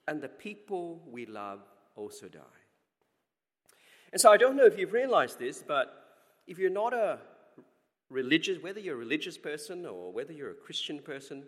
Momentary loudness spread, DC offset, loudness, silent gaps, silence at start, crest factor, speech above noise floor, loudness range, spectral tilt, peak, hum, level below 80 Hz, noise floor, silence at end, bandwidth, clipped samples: 21 LU; under 0.1%; -29 LUFS; none; 0.05 s; 26 dB; 55 dB; 17 LU; -3 dB/octave; -4 dBFS; none; -90 dBFS; -85 dBFS; 0.05 s; 16 kHz; under 0.1%